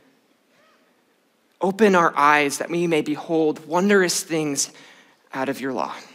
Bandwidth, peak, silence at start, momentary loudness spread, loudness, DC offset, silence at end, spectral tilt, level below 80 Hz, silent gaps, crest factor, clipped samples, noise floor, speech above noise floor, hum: 16 kHz; -4 dBFS; 1.6 s; 11 LU; -21 LUFS; under 0.1%; 0.1 s; -4 dB/octave; -76 dBFS; none; 20 dB; under 0.1%; -63 dBFS; 43 dB; none